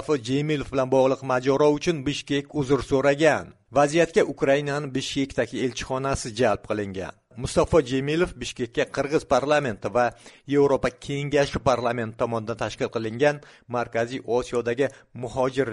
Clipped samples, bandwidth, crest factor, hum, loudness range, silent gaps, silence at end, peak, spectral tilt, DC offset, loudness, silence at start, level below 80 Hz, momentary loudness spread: under 0.1%; 11.5 kHz; 18 dB; none; 4 LU; none; 0 s; -6 dBFS; -5.5 dB/octave; under 0.1%; -24 LUFS; 0 s; -48 dBFS; 8 LU